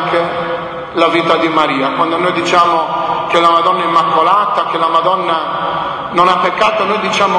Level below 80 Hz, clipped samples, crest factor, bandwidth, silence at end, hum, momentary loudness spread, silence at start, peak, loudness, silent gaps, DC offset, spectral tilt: -50 dBFS; under 0.1%; 12 dB; 10.5 kHz; 0 s; none; 6 LU; 0 s; 0 dBFS; -12 LUFS; none; under 0.1%; -4.5 dB/octave